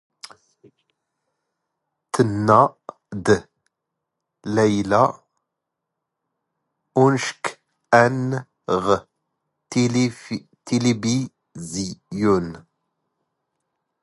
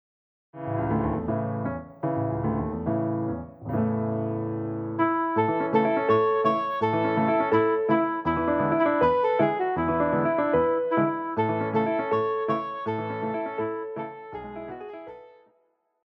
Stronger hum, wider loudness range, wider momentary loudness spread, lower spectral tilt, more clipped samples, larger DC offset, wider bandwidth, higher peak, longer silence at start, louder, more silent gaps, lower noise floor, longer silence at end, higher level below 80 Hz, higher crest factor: neither; about the same, 4 LU vs 6 LU; first, 15 LU vs 11 LU; second, -5.5 dB/octave vs -10 dB/octave; neither; neither; first, 11.5 kHz vs 5.8 kHz; first, 0 dBFS vs -10 dBFS; first, 2.15 s vs 0.55 s; first, -21 LUFS vs -25 LUFS; neither; first, -82 dBFS vs -70 dBFS; first, 1.4 s vs 0.8 s; about the same, -54 dBFS vs -50 dBFS; first, 22 dB vs 16 dB